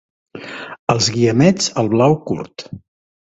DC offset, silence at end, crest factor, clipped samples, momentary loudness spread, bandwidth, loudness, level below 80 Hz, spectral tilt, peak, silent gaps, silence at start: under 0.1%; 0.55 s; 18 dB; under 0.1%; 20 LU; 8.4 kHz; -16 LUFS; -52 dBFS; -5 dB/octave; 0 dBFS; 0.79-0.87 s; 0.35 s